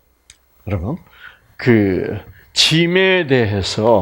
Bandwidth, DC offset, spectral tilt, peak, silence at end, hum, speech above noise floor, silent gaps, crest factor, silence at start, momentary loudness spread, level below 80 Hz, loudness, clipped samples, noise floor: 16 kHz; under 0.1%; -5 dB/octave; 0 dBFS; 0 s; none; 35 dB; none; 16 dB; 0.65 s; 14 LU; -46 dBFS; -15 LUFS; under 0.1%; -51 dBFS